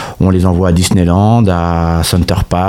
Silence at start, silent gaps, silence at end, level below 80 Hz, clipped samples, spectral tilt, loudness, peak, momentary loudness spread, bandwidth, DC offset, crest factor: 0 s; none; 0 s; -24 dBFS; under 0.1%; -6 dB/octave; -11 LUFS; 0 dBFS; 4 LU; 16.5 kHz; under 0.1%; 10 dB